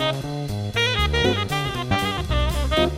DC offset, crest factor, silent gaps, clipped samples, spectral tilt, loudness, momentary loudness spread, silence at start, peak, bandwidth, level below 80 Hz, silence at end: under 0.1%; 16 dB; none; under 0.1%; -5 dB/octave; -22 LUFS; 7 LU; 0 s; -6 dBFS; 16 kHz; -28 dBFS; 0 s